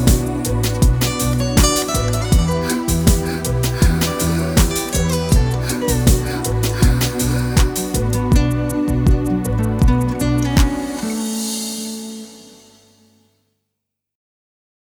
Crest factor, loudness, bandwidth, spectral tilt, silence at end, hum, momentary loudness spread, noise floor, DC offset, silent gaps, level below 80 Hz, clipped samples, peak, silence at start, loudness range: 16 dB; -18 LUFS; over 20 kHz; -5 dB/octave; 2.55 s; 50 Hz at -35 dBFS; 6 LU; -79 dBFS; under 0.1%; none; -22 dBFS; under 0.1%; 0 dBFS; 0 s; 9 LU